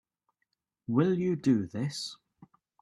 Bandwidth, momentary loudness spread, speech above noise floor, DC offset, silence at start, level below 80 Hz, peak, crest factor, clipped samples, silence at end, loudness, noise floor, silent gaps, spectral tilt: 12 kHz; 12 LU; 54 dB; under 0.1%; 0.9 s; -70 dBFS; -14 dBFS; 18 dB; under 0.1%; 0.65 s; -30 LUFS; -82 dBFS; none; -6.5 dB/octave